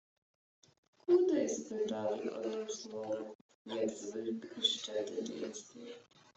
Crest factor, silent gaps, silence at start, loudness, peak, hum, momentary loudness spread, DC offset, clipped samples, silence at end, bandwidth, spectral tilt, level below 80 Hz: 20 dB; 3.35-3.49 s, 3.55-3.65 s; 1.1 s; -37 LUFS; -18 dBFS; none; 18 LU; under 0.1%; under 0.1%; 0.35 s; 8.2 kHz; -3.5 dB/octave; -84 dBFS